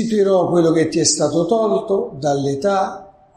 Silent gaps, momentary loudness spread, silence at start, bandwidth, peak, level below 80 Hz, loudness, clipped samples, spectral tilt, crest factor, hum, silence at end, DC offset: none; 6 LU; 0 s; 11 kHz; -2 dBFS; -54 dBFS; -17 LUFS; under 0.1%; -4.5 dB/octave; 16 dB; none; 0.3 s; under 0.1%